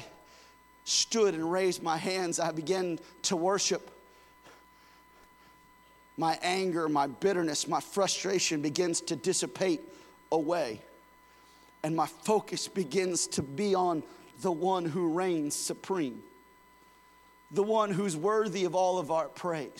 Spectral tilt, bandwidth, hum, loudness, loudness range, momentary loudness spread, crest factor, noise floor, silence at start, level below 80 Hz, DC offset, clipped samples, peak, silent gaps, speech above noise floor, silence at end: -3.5 dB/octave; 17 kHz; none; -30 LUFS; 4 LU; 8 LU; 22 dB; -59 dBFS; 0 s; -72 dBFS; under 0.1%; under 0.1%; -10 dBFS; none; 29 dB; 0 s